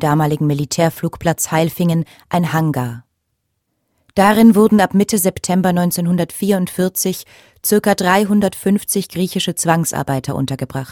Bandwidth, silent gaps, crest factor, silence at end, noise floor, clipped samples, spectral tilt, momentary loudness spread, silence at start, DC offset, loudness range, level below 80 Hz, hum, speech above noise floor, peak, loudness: 17.5 kHz; none; 16 dB; 0 s; -71 dBFS; under 0.1%; -5.5 dB/octave; 9 LU; 0 s; under 0.1%; 4 LU; -50 dBFS; none; 55 dB; 0 dBFS; -16 LUFS